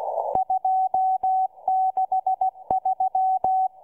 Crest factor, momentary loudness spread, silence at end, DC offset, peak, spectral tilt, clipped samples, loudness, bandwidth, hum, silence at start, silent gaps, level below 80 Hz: 16 dB; 3 LU; 0.15 s; under 0.1%; -8 dBFS; -8.5 dB/octave; under 0.1%; -23 LUFS; 1.3 kHz; none; 0 s; none; -62 dBFS